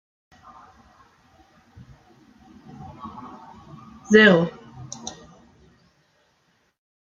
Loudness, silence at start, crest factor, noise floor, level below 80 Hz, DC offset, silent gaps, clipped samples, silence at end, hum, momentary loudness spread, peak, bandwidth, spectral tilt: -16 LUFS; 3.05 s; 24 dB; -66 dBFS; -62 dBFS; under 0.1%; none; under 0.1%; 2 s; none; 31 LU; -2 dBFS; 7.6 kHz; -5 dB/octave